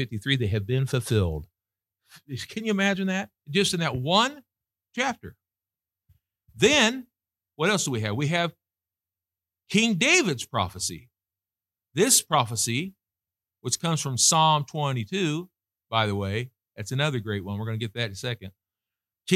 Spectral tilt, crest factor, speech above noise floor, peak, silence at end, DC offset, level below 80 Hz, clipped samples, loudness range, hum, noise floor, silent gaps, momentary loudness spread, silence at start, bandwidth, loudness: -3.5 dB/octave; 22 dB; over 65 dB; -6 dBFS; 0 s; under 0.1%; -54 dBFS; under 0.1%; 5 LU; none; under -90 dBFS; none; 15 LU; 0 s; 16.5 kHz; -25 LUFS